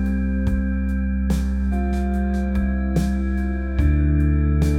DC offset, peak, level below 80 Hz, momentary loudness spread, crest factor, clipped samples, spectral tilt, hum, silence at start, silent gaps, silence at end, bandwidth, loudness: under 0.1%; -8 dBFS; -22 dBFS; 4 LU; 12 dB; under 0.1%; -8.5 dB/octave; none; 0 s; none; 0 s; 10.5 kHz; -22 LUFS